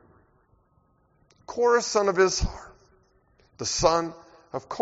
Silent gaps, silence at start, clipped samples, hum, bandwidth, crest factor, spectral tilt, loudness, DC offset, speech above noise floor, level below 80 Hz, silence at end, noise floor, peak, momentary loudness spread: none; 1.5 s; under 0.1%; none; 8 kHz; 22 dB; -3 dB/octave; -24 LUFS; under 0.1%; 41 dB; -42 dBFS; 0 s; -65 dBFS; -6 dBFS; 16 LU